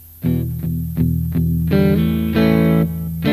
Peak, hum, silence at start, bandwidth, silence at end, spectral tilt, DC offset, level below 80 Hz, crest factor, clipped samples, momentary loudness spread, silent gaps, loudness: -2 dBFS; none; 0 s; 15.5 kHz; 0 s; -8.5 dB/octave; under 0.1%; -32 dBFS; 14 dB; under 0.1%; 7 LU; none; -18 LUFS